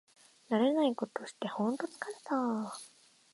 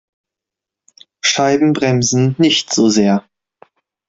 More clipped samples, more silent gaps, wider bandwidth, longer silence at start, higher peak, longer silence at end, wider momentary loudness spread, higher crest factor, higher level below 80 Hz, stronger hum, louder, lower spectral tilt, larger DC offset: neither; neither; first, 11.5 kHz vs 8 kHz; second, 0.5 s vs 1.25 s; second, -18 dBFS vs 0 dBFS; second, 0.45 s vs 0.9 s; first, 14 LU vs 4 LU; about the same, 18 dB vs 16 dB; second, -88 dBFS vs -54 dBFS; neither; second, -34 LUFS vs -14 LUFS; first, -5.5 dB/octave vs -4 dB/octave; neither